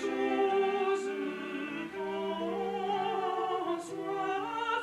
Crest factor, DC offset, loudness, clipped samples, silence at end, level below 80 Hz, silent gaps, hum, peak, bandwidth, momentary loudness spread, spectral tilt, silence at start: 14 dB; under 0.1%; -33 LUFS; under 0.1%; 0 s; -72 dBFS; none; none; -18 dBFS; 12 kHz; 8 LU; -5 dB/octave; 0 s